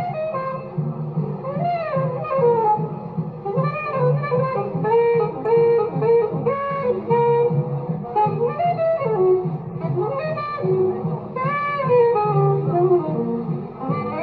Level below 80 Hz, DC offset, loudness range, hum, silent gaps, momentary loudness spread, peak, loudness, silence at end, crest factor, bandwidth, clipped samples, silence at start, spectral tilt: -56 dBFS; under 0.1%; 3 LU; none; none; 9 LU; -6 dBFS; -21 LUFS; 0 s; 14 dB; 4.8 kHz; under 0.1%; 0 s; -11.5 dB/octave